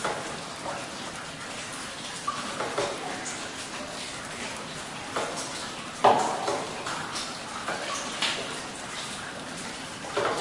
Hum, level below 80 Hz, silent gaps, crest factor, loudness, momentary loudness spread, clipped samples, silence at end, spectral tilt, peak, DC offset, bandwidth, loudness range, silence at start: none; -62 dBFS; none; 26 dB; -31 LUFS; 8 LU; under 0.1%; 0 s; -2.5 dB/octave; -6 dBFS; under 0.1%; 11.5 kHz; 5 LU; 0 s